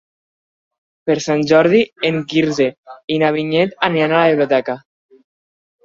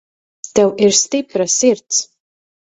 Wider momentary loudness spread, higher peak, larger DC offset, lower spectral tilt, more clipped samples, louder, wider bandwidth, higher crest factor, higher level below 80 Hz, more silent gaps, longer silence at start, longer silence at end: about the same, 10 LU vs 9 LU; about the same, 0 dBFS vs 0 dBFS; neither; first, -5.5 dB/octave vs -2.5 dB/octave; neither; about the same, -16 LUFS vs -15 LUFS; second, 7.6 kHz vs 8.4 kHz; about the same, 16 dB vs 16 dB; about the same, -58 dBFS vs -58 dBFS; first, 2.78-2.84 s, 3.04-3.08 s vs none; first, 1.05 s vs 0.45 s; first, 1.05 s vs 0.65 s